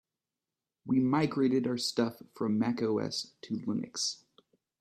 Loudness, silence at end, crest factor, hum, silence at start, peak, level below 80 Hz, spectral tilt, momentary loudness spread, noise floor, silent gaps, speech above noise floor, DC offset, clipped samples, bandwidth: -31 LUFS; 0.65 s; 18 dB; none; 0.85 s; -16 dBFS; -74 dBFS; -5 dB/octave; 9 LU; under -90 dBFS; none; over 59 dB; under 0.1%; under 0.1%; 14 kHz